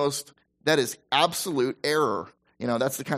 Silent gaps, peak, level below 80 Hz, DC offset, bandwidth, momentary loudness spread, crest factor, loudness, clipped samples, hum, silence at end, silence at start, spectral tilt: none; -6 dBFS; -68 dBFS; under 0.1%; 15.5 kHz; 11 LU; 20 dB; -26 LUFS; under 0.1%; none; 0 s; 0 s; -3.5 dB/octave